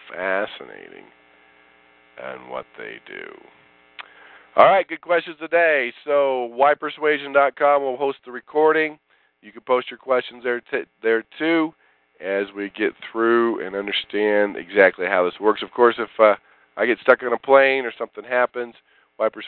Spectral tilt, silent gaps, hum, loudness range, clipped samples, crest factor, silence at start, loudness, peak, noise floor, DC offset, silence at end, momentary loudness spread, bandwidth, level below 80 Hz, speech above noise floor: -8 dB/octave; none; none; 10 LU; under 0.1%; 20 dB; 0.05 s; -20 LUFS; 0 dBFS; -55 dBFS; under 0.1%; 0 s; 18 LU; 4.5 kHz; -70 dBFS; 34 dB